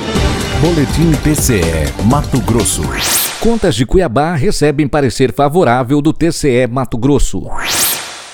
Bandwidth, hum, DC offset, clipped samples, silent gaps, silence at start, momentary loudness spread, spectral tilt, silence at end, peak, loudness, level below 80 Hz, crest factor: over 20 kHz; none; under 0.1%; under 0.1%; none; 0 s; 4 LU; -4.5 dB/octave; 0 s; 0 dBFS; -13 LUFS; -24 dBFS; 12 dB